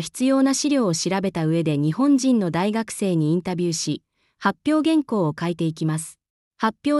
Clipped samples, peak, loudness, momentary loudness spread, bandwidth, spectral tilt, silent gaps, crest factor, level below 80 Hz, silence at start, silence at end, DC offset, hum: under 0.1%; -6 dBFS; -22 LUFS; 7 LU; 12 kHz; -5.5 dB/octave; 6.30-6.51 s; 14 dB; -62 dBFS; 0 s; 0 s; under 0.1%; none